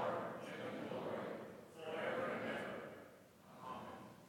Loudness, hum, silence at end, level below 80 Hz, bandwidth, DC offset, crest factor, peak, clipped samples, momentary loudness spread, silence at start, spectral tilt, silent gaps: -46 LUFS; none; 0 s; -86 dBFS; 18 kHz; under 0.1%; 18 dB; -28 dBFS; under 0.1%; 14 LU; 0 s; -5.5 dB/octave; none